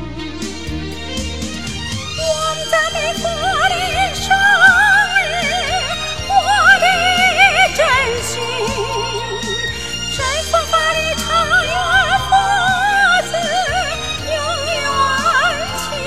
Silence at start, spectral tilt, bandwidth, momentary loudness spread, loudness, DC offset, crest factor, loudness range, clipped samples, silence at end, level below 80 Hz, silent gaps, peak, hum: 0 s; -2 dB/octave; 16 kHz; 13 LU; -14 LUFS; 2%; 16 dB; 6 LU; under 0.1%; 0 s; -34 dBFS; none; 0 dBFS; none